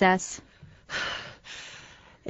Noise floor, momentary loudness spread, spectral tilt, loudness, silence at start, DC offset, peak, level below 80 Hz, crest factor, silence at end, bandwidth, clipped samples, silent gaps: -51 dBFS; 18 LU; -3.5 dB/octave; -32 LUFS; 0 s; under 0.1%; -6 dBFS; -60 dBFS; 24 dB; 0 s; 8.2 kHz; under 0.1%; none